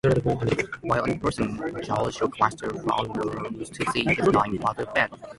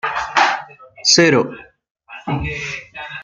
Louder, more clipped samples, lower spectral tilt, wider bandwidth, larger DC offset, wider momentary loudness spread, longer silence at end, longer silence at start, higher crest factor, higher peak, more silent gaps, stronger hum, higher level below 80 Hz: second, -26 LUFS vs -16 LUFS; neither; first, -6 dB/octave vs -3 dB/octave; first, 11.5 kHz vs 10 kHz; neither; second, 8 LU vs 17 LU; about the same, 0.05 s vs 0 s; about the same, 0.05 s vs 0.05 s; about the same, 22 dB vs 18 dB; second, -4 dBFS vs 0 dBFS; second, none vs 1.91-1.95 s; neither; about the same, -48 dBFS vs -44 dBFS